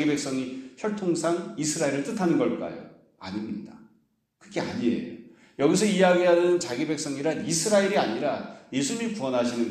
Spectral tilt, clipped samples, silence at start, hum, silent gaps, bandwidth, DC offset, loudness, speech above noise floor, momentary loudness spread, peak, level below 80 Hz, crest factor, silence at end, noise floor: -4.5 dB/octave; under 0.1%; 0 s; none; none; 14.5 kHz; under 0.1%; -26 LUFS; 42 dB; 16 LU; -8 dBFS; -68 dBFS; 18 dB; 0 s; -67 dBFS